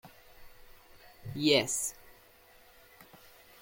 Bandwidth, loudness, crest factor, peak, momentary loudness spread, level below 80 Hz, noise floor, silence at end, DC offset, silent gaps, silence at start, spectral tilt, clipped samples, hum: 17 kHz; -29 LUFS; 24 dB; -12 dBFS; 28 LU; -64 dBFS; -59 dBFS; 0.6 s; under 0.1%; none; 0.05 s; -3 dB/octave; under 0.1%; none